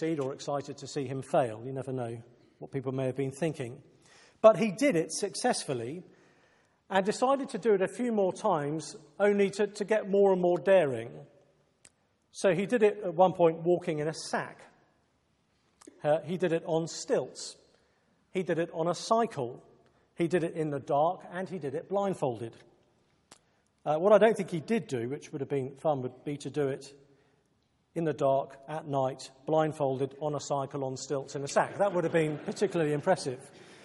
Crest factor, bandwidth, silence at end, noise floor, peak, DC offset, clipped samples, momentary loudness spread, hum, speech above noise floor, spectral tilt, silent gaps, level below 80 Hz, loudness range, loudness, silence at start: 24 dB; 11.5 kHz; 0.1 s; -72 dBFS; -6 dBFS; under 0.1%; under 0.1%; 14 LU; none; 43 dB; -5.5 dB/octave; none; -76 dBFS; 6 LU; -30 LUFS; 0 s